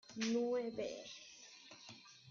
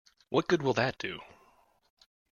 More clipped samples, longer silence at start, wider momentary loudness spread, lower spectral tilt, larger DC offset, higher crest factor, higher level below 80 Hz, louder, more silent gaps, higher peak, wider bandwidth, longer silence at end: neither; second, 0.1 s vs 0.3 s; first, 18 LU vs 11 LU; second, -3.5 dB/octave vs -5.5 dB/octave; neither; second, 16 dB vs 22 dB; second, -82 dBFS vs -68 dBFS; second, -41 LUFS vs -30 LUFS; neither; second, -26 dBFS vs -12 dBFS; about the same, 7.4 kHz vs 7.2 kHz; second, 0 s vs 1.05 s